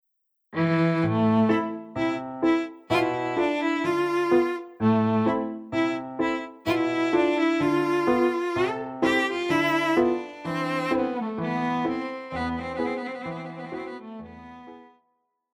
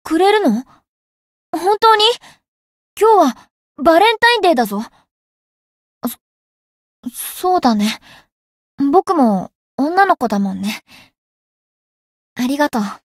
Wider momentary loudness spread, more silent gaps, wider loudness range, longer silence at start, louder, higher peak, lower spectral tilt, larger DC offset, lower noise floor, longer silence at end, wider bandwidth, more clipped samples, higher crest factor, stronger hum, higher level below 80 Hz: second, 13 LU vs 17 LU; second, none vs 0.89-1.53 s, 2.48-2.97 s, 3.50-3.75 s, 5.11-6.01 s, 6.21-7.03 s, 8.32-8.78 s, 9.55-9.78 s, 11.18-12.36 s; about the same, 7 LU vs 8 LU; first, 0.5 s vs 0.05 s; second, -25 LUFS vs -15 LUFS; second, -10 dBFS vs 0 dBFS; first, -6.5 dB/octave vs -4.5 dB/octave; neither; second, -76 dBFS vs under -90 dBFS; first, 0.7 s vs 0.2 s; about the same, 16 kHz vs 16 kHz; neither; about the same, 16 dB vs 18 dB; neither; about the same, -58 dBFS vs -58 dBFS